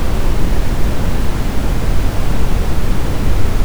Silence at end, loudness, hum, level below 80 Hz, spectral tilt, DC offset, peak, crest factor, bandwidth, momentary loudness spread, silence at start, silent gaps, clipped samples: 0 s; -19 LUFS; none; -16 dBFS; -6 dB/octave; under 0.1%; 0 dBFS; 10 dB; over 20 kHz; 1 LU; 0 s; none; under 0.1%